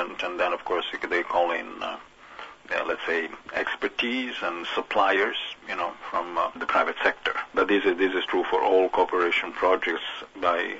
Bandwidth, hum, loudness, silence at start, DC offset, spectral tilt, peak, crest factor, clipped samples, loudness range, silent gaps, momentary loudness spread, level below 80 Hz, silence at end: 8 kHz; none; -26 LUFS; 0 s; under 0.1%; -3.5 dB/octave; -8 dBFS; 20 dB; under 0.1%; 5 LU; none; 9 LU; -62 dBFS; 0 s